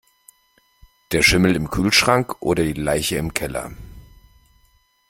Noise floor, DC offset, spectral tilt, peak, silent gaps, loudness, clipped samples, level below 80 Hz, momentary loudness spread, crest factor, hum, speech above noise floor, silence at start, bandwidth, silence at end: -61 dBFS; under 0.1%; -4 dB/octave; 0 dBFS; none; -19 LUFS; under 0.1%; -40 dBFS; 11 LU; 22 dB; none; 42 dB; 1.1 s; 16.5 kHz; 1.1 s